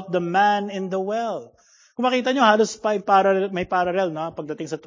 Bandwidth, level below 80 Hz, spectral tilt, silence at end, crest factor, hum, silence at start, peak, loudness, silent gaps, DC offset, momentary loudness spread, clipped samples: 7.6 kHz; -60 dBFS; -5 dB/octave; 0.1 s; 20 dB; none; 0 s; -2 dBFS; -21 LUFS; none; under 0.1%; 13 LU; under 0.1%